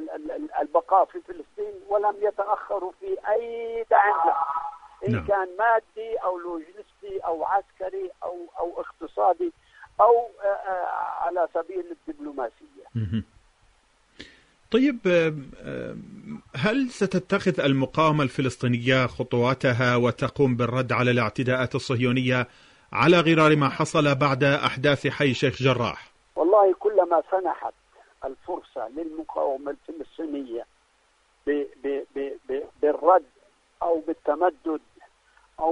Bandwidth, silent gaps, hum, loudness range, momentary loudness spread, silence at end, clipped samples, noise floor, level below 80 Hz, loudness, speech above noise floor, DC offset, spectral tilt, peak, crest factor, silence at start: 10.5 kHz; none; none; 10 LU; 15 LU; 0 s; under 0.1%; -64 dBFS; -58 dBFS; -24 LUFS; 41 dB; under 0.1%; -6.5 dB/octave; -6 dBFS; 20 dB; 0 s